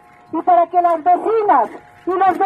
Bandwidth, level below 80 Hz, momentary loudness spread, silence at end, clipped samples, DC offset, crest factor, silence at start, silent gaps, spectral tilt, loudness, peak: 4.7 kHz; -64 dBFS; 11 LU; 0 s; under 0.1%; under 0.1%; 14 dB; 0.35 s; none; -6.5 dB/octave; -16 LUFS; -2 dBFS